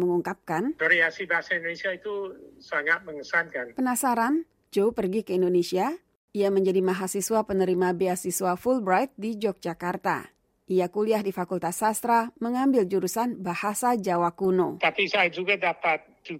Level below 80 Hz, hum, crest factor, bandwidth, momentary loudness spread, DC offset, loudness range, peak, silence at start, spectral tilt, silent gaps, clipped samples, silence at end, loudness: -64 dBFS; none; 18 dB; 16 kHz; 7 LU; under 0.1%; 2 LU; -8 dBFS; 0 s; -4.5 dB/octave; 6.17-6.28 s; under 0.1%; 0 s; -26 LUFS